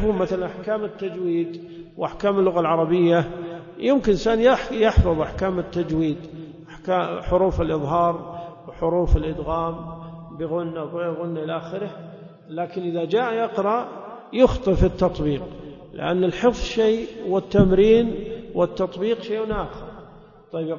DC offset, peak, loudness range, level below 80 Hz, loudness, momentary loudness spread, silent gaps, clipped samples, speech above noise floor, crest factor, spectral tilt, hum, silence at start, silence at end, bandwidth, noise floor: under 0.1%; -2 dBFS; 6 LU; -34 dBFS; -22 LUFS; 17 LU; none; under 0.1%; 25 dB; 20 dB; -7.5 dB/octave; none; 0 s; 0 s; 7.2 kHz; -46 dBFS